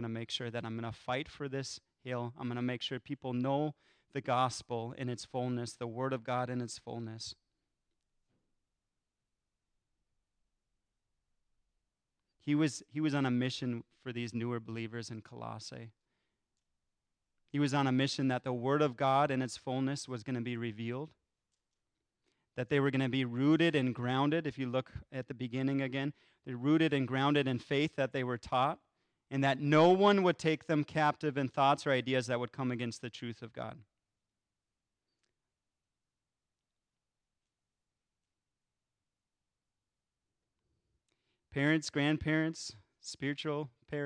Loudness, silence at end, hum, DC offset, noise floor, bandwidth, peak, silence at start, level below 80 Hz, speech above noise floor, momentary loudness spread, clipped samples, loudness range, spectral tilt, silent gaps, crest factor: -34 LUFS; 0 s; none; under 0.1%; under -90 dBFS; 10.5 kHz; -16 dBFS; 0 s; -70 dBFS; over 56 dB; 15 LU; under 0.1%; 13 LU; -6 dB/octave; none; 20 dB